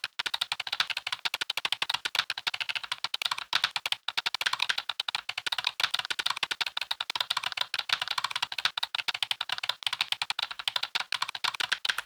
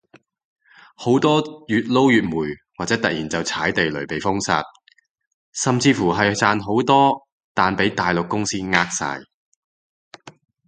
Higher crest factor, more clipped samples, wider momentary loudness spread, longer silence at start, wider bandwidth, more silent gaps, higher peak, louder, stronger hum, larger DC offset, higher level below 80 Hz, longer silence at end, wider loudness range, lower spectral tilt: about the same, 24 dB vs 20 dB; neither; second, 4 LU vs 12 LU; second, 0.05 s vs 1 s; first, over 20 kHz vs 9.4 kHz; second, none vs 5.11-5.15 s, 5.27-5.53 s, 7.32-7.55 s, 9.34-10.11 s; second, -8 dBFS vs 0 dBFS; second, -30 LUFS vs -20 LUFS; neither; neither; second, -76 dBFS vs -52 dBFS; second, 0 s vs 0.35 s; second, 1 LU vs 4 LU; second, 1.5 dB/octave vs -4.5 dB/octave